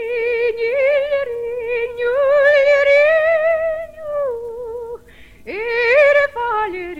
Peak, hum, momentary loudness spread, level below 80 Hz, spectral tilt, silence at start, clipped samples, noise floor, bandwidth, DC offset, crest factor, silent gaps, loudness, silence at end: -4 dBFS; none; 16 LU; -50 dBFS; -3.5 dB/octave; 0 s; under 0.1%; -43 dBFS; 7.4 kHz; under 0.1%; 14 dB; none; -16 LUFS; 0 s